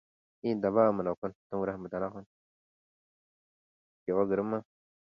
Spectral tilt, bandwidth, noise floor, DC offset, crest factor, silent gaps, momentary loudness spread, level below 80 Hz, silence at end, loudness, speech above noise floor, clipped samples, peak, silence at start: -10 dB/octave; 5.8 kHz; under -90 dBFS; under 0.1%; 22 dB; 1.17-1.22 s, 1.35-1.50 s, 2.26-4.06 s; 12 LU; -68 dBFS; 0.5 s; -32 LUFS; over 59 dB; under 0.1%; -12 dBFS; 0.45 s